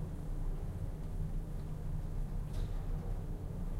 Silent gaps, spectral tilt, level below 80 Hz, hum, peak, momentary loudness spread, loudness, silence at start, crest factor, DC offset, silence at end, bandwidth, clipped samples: none; -8 dB/octave; -40 dBFS; none; -26 dBFS; 2 LU; -43 LUFS; 0 s; 12 dB; under 0.1%; 0 s; 12 kHz; under 0.1%